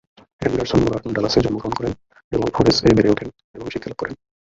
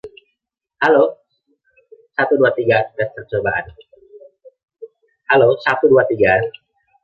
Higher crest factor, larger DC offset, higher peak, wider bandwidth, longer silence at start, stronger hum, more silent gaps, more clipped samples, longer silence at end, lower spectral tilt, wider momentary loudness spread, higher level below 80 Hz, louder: about the same, 20 dB vs 16 dB; neither; about the same, 0 dBFS vs -2 dBFS; first, 7.8 kHz vs 6.6 kHz; first, 0.4 s vs 0.05 s; neither; first, 2.24-2.31 s, 3.44-3.54 s vs 4.63-4.68 s; neither; second, 0.35 s vs 0.55 s; second, -6 dB/octave vs -7.5 dB/octave; first, 15 LU vs 11 LU; first, -40 dBFS vs -52 dBFS; second, -20 LUFS vs -16 LUFS